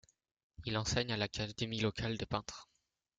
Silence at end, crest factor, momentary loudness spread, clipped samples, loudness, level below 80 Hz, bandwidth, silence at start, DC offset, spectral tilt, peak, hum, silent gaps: 0.55 s; 22 dB; 11 LU; under 0.1%; -38 LUFS; -58 dBFS; 9.4 kHz; 0.6 s; under 0.1%; -4.5 dB/octave; -18 dBFS; none; none